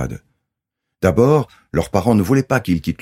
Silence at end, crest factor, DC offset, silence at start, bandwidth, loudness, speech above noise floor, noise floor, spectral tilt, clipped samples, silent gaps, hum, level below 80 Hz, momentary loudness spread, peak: 0.05 s; 18 dB; under 0.1%; 0 s; 16.5 kHz; -17 LUFS; 63 dB; -80 dBFS; -7.5 dB/octave; under 0.1%; none; none; -40 dBFS; 9 LU; 0 dBFS